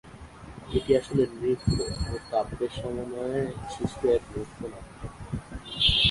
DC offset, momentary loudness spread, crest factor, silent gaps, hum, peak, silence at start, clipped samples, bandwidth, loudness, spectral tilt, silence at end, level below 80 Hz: under 0.1%; 18 LU; 20 dB; none; none; -8 dBFS; 0.05 s; under 0.1%; 11.5 kHz; -28 LUFS; -5 dB/octave; 0 s; -42 dBFS